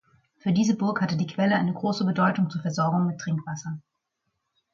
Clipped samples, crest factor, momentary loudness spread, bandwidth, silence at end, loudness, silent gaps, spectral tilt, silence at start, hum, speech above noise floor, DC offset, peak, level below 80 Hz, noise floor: under 0.1%; 16 dB; 10 LU; 7.4 kHz; 0.95 s; -25 LUFS; none; -6.5 dB/octave; 0.45 s; none; 54 dB; under 0.1%; -10 dBFS; -68 dBFS; -79 dBFS